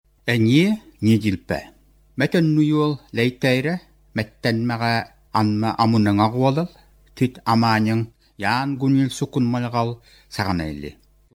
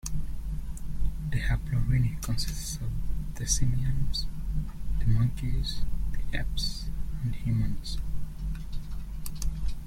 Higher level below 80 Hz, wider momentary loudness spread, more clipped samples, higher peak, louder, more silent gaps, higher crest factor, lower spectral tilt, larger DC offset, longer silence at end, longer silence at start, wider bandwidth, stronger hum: second, -50 dBFS vs -32 dBFS; about the same, 11 LU vs 11 LU; neither; first, -4 dBFS vs -12 dBFS; first, -21 LUFS vs -32 LUFS; neither; about the same, 18 dB vs 16 dB; first, -6.5 dB/octave vs -4.5 dB/octave; neither; first, 0.45 s vs 0 s; first, 0.25 s vs 0.05 s; about the same, 16 kHz vs 15.5 kHz; neither